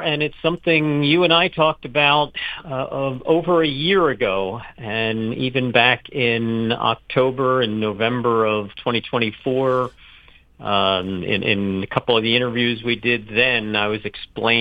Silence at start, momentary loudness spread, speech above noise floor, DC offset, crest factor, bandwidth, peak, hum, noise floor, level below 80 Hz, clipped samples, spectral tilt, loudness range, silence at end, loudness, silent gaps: 0 s; 9 LU; 29 dB; under 0.1%; 20 dB; 8.2 kHz; 0 dBFS; none; -48 dBFS; -50 dBFS; under 0.1%; -7.5 dB/octave; 3 LU; 0 s; -19 LUFS; none